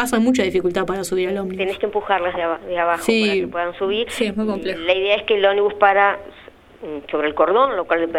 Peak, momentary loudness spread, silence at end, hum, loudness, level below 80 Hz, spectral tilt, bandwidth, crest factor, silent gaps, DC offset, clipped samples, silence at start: -2 dBFS; 8 LU; 0 s; none; -19 LUFS; -50 dBFS; -4.5 dB/octave; 16 kHz; 18 dB; none; under 0.1%; under 0.1%; 0 s